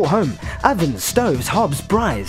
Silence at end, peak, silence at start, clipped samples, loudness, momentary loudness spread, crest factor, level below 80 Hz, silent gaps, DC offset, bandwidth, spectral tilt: 0 s; 0 dBFS; 0 s; under 0.1%; -19 LUFS; 2 LU; 18 dB; -34 dBFS; none; under 0.1%; 16.5 kHz; -5 dB/octave